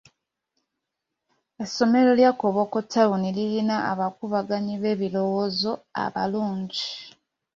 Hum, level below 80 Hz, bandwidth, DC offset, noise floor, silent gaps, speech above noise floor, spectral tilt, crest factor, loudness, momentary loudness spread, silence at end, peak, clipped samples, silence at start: none; -66 dBFS; 7.6 kHz; under 0.1%; -83 dBFS; none; 60 dB; -6 dB/octave; 20 dB; -24 LUFS; 10 LU; 0.45 s; -6 dBFS; under 0.1%; 1.6 s